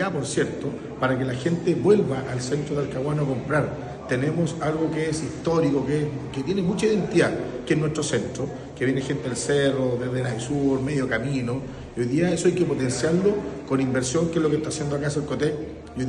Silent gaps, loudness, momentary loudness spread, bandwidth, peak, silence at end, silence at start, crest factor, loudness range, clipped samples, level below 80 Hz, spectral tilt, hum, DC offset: none; -24 LUFS; 8 LU; 11 kHz; -6 dBFS; 0 s; 0 s; 18 dB; 2 LU; under 0.1%; -48 dBFS; -6 dB/octave; none; under 0.1%